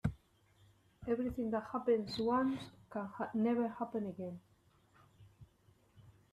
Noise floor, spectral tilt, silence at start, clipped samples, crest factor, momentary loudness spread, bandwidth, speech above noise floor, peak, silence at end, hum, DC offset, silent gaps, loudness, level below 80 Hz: -69 dBFS; -7.5 dB/octave; 0.05 s; under 0.1%; 18 dB; 12 LU; 12.5 kHz; 33 dB; -20 dBFS; 0.2 s; none; under 0.1%; none; -38 LUFS; -62 dBFS